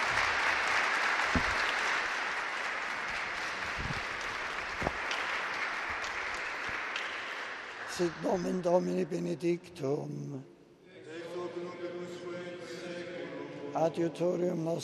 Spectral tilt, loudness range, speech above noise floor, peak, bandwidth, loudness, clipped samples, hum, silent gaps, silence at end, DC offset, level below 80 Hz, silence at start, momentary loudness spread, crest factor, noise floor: -4 dB/octave; 10 LU; 23 dB; -14 dBFS; 13 kHz; -33 LUFS; under 0.1%; none; none; 0 s; under 0.1%; -56 dBFS; 0 s; 13 LU; 20 dB; -55 dBFS